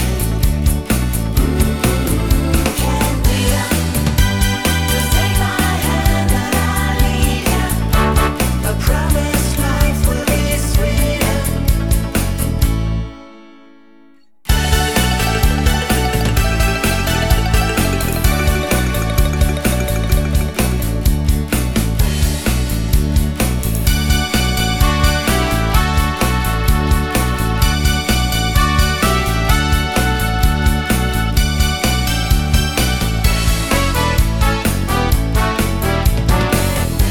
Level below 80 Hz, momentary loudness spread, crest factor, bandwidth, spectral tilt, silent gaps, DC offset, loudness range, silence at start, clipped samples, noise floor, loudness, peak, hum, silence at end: -18 dBFS; 3 LU; 14 dB; 19 kHz; -4.5 dB/octave; none; 1%; 2 LU; 0 s; under 0.1%; -50 dBFS; -16 LUFS; 0 dBFS; none; 0 s